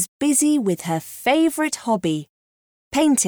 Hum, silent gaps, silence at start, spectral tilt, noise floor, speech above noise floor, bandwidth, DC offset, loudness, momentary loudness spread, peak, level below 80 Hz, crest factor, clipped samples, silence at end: none; 0.08-0.20 s, 2.29-2.91 s; 0 s; -3.5 dB/octave; under -90 dBFS; over 70 dB; over 20 kHz; under 0.1%; -20 LUFS; 8 LU; -6 dBFS; -60 dBFS; 14 dB; under 0.1%; 0 s